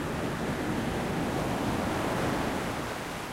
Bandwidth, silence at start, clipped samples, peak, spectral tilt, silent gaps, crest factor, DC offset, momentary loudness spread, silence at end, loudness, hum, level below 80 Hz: 16 kHz; 0 s; under 0.1%; -18 dBFS; -5.5 dB/octave; none; 14 dB; under 0.1%; 4 LU; 0 s; -31 LUFS; none; -46 dBFS